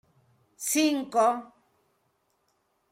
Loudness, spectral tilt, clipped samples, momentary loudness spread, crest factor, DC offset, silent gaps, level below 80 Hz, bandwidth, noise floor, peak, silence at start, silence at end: -26 LUFS; -2 dB/octave; under 0.1%; 10 LU; 18 dB; under 0.1%; none; -78 dBFS; 16 kHz; -73 dBFS; -12 dBFS; 0.6 s; 1.45 s